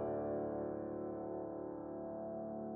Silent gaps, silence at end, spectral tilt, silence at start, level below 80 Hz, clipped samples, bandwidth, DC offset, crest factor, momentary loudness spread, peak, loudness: none; 0 s; -10.5 dB/octave; 0 s; -70 dBFS; under 0.1%; 3.2 kHz; under 0.1%; 12 dB; 6 LU; -30 dBFS; -43 LUFS